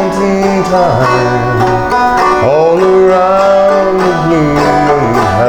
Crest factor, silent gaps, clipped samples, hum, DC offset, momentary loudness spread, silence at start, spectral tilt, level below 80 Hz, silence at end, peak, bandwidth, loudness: 8 dB; none; under 0.1%; none; under 0.1%; 4 LU; 0 s; -6.5 dB/octave; -32 dBFS; 0 s; 0 dBFS; 18 kHz; -9 LUFS